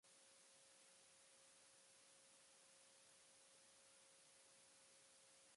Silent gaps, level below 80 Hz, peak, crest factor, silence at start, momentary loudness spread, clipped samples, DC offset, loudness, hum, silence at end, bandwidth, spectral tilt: none; under -90 dBFS; -58 dBFS; 14 dB; 0.05 s; 0 LU; under 0.1%; under 0.1%; -68 LUFS; none; 0 s; 11.5 kHz; 0 dB/octave